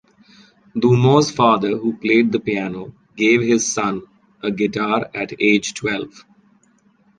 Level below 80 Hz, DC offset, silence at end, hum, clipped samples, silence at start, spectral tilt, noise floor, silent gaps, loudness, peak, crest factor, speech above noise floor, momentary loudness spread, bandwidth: -56 dBFS; under 0.1%; 1.1 s; none; under 0.1%; 0.75 s; -5 dB/octave; -57 dBFS; none; -18 LUFS; -2 dBFS; 18 dB; 40 dB; 13 LU; 10 kHz